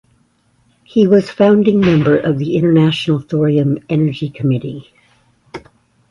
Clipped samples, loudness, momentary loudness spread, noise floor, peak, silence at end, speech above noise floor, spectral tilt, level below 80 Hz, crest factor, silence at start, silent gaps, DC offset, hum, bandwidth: under 0.1%; -14 LUFS; 19 LU; -57 dBFS; 0 dBFS; 0.5 s; 44 dB; -8.5 dB/octave; -50 dBFS; 14 dB; 0.95 s; none; under 0.1%; none; 11 kHz